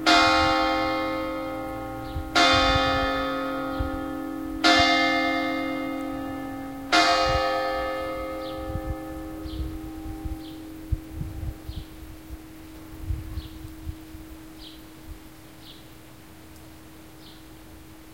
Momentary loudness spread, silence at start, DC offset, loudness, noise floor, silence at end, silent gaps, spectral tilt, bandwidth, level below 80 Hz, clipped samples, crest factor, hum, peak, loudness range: 26 LU; 0 s; 0.2%; -25 LUFS; -47 dBFS; 0 s; none; -4 dB/octave; 16.5 kHz; -40 dBFS; under 0.1%; 22 dB; none; -6 dBFS; 21 LU